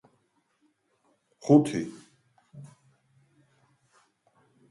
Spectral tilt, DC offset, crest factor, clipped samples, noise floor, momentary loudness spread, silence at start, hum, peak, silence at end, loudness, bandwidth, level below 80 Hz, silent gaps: -7.5 dB/octave; under 0.1%; 26 dB; under 0.1%; -71 dBFS; 28 LU; 1.45 s; none; -6 dBFS; 2.1 s; -25 LUFS; 11.5 kHz; -74 dBFS; none